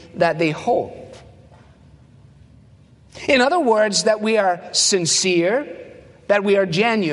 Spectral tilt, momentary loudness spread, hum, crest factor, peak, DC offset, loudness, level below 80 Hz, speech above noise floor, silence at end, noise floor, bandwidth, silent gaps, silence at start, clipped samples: -3 dB/octave; 10 LU; none; 18 dB; -2 dBFS; under 0.1%; -18 LUFS; -56 dBFS; 31 dB; 0 s; -49 dBFS; 11.5 kHz; none; 0.15 s; under 0.1%